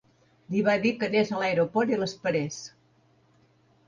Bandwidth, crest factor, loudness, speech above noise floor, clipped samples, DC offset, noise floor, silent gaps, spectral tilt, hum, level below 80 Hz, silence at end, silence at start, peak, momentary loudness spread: 7.6 kHz; 16 dB; -26 LUFS; 38 dB; under 0.1%; under 0.1%; -63 dBFS; none; -5.5 dB/octave; none; -68 dBFS; 1.2 s; 0.5 s; -12 dBFS; 9 LU